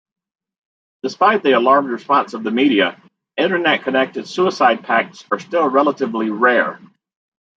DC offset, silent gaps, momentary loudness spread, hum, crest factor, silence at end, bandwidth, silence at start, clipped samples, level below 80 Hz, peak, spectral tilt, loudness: under 0.1%; none; 8 LU; none; 16 dB; 0.8 s; 7.8 kHz; 1.05 s; under 0.1%; -70 dBFS; -2 dBFS; -5 dB/octave; -16 LUFS